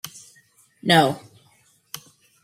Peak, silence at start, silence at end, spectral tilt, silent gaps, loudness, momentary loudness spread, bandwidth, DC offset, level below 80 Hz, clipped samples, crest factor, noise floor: -2 dBFS; 0.05 s; 0.45 s; -4.5 dB/octave; none; -19 LUFS; 22 LU; 16 kHz; under 0.1%; -66 dBFS; under 0.1%; 24 dB; -60 dBFS